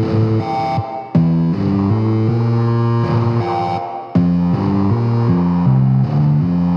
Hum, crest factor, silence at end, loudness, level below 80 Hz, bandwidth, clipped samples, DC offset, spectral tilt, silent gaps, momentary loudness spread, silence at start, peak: none; 12 dB; 0 s; -16 LUFS; -42 dBFS; 6.2 kHz; under 0.1%; under 0.1%; -10 dB/octave; none; 5 LU; 0 s; -2 dBFS